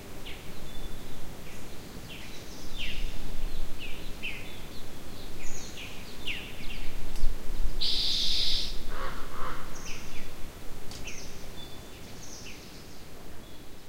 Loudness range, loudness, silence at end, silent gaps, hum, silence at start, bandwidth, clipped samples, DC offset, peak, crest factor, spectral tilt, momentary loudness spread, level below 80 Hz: 12 LU; -36 LUFS; 0 s; none; none; 0 s; 15.5 kHz; under 0.1%; under 0.1%; -8 dBFS; 16 dB; -3 dB/octave; 17 LU; -34 dBFS